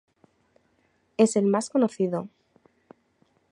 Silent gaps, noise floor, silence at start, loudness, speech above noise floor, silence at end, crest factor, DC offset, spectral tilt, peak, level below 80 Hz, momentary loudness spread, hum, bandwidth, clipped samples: none; -68 dBFS; 1.2 s; -24 LUFS; 45 dB; 1.25 s; 22 dB; under 0.1%; -6 dB/octave; -6 dBFS; -76 dBFS; 15 LU; none; 11 kHz; under 0.1%